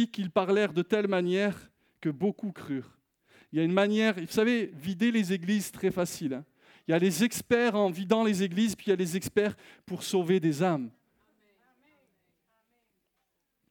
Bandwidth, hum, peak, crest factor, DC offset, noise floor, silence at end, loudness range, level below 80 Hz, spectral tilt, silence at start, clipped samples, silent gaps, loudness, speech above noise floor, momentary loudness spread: 19 kHz; none; -10 dBFS; 20 dB; under 0.1%; -79 dBFS; 2.8 s; 5 LU; -70 dBFS; -5.5 dB/octave; 0 s; under 0.1%; none; -28 LUFS; 52 dB; 11 LU